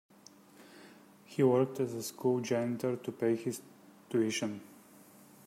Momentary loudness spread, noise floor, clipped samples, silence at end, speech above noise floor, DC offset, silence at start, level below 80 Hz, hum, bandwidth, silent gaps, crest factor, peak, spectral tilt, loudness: 15 LU; -59 dBFS; under 0.1%; 0.7 s; 27 dB; under 0.1%; 0.6 s; -82 dBFS; none; 16 kHz; none; 20 dB; -16 dBFS; -5.5 dB/octave; -33 LUFS